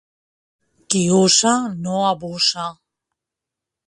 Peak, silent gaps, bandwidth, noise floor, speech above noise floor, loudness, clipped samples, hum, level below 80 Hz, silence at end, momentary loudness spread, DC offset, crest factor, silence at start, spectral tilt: 0 dBFS; none; 11.5 kHz; -85 dBFS; 67 dB; -17 LUFS; under 0.1%; none; -60 dBFS; 1.15 s; 10 LU; under 0.1%; 20 dB; 0.9 s; -3.5 dB/octave